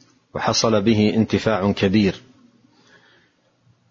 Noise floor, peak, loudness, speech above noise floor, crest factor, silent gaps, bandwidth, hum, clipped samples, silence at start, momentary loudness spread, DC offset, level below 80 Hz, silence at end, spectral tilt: -60 dBFS; -4 dBFS; -19 LUFS; 42 dB; 18 dB; none; 7.4 kHz; none; under 0.1%; 0.35 s; 8 LU; under 0.1%; -52 dBFS; 1.7 s; -5 dB/octave